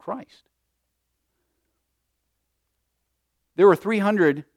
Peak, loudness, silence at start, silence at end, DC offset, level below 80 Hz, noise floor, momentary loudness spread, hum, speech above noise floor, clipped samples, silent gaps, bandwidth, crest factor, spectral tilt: -4 dBFS; -19 LUFS; 0.05 s; 0.15 s; under 0.1%; -74 dBFS; -77 dBFS; 18 LU; none; 56 dB; under 0.1%; none; 14.5 kHz; 22 dB; -7.5 dB/octave